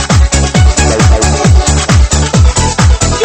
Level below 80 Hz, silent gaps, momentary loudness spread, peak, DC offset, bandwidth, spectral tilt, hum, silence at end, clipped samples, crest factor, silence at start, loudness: -10 dBFS; none; 1 LU; 0 dBFS; under 0.1%; 8.8 kHz; -4.5 dB/octave; none; 0 s; 1%; 8 dB; 0 s; -8 LUFS